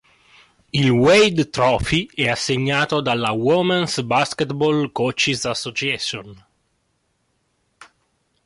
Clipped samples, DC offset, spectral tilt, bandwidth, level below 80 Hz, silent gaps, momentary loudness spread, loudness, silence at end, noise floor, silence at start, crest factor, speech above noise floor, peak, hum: under 0.1%; under 0.1%; -4.5 dB/octave; 11.5 kHz; -46 dBFS; none; 8 LU; -19 LUFS; 0.6 s; -68 dBFS; 0.75 s; 16 dB; 49 dB; -6 dBFS; none